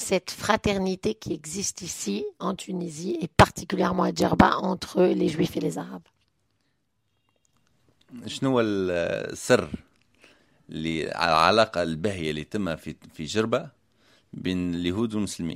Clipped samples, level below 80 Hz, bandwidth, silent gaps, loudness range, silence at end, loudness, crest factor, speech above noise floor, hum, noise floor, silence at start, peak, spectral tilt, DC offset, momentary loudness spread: under 0.1%; -48 dBFS; 16 kHz; none; 7 LU; 0 s; -25 LUFS; 24 dB; 49 dB; none; -75 dBFS; 0 s; -2 dBFS; -5 dB/octave; under 0.1%; 15 LU